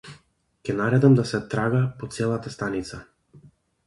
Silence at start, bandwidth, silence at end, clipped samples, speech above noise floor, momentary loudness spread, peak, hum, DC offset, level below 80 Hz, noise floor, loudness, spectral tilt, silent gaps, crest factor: 0.05 s; 11.5 kHz; 0.45 s; under 0.1%; 38 dB; 16 LU; -4 dBFS; none; under 0.1%; -54 dBFS; -60 dBFS; -23 LUFS; -7.5 dB/octave; none; 20 dB